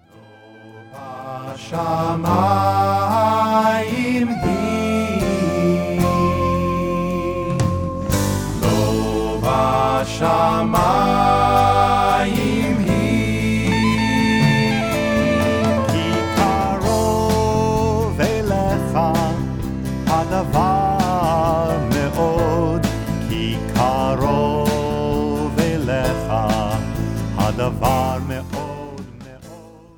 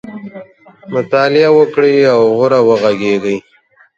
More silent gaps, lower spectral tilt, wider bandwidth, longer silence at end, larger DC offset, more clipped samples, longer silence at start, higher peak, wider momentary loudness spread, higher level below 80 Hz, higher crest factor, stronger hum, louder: neither; about the same, -6 dB/octave vs -6.5 dB/octave; first, 19.5 kHz vs 7.6 kHz; second, 0.25 s vs 0.6 s; neither; neither; first, 0.55 s vs 0.05 s; about the same, -2 dBFS vs 0 dBFS; second, 8 LU vs 13 LU; first, -34 dBFS vs -58 dBFS; about the same, 16 dB vs 12 dB; neither; second, -18 LUFS vs -11 LUFS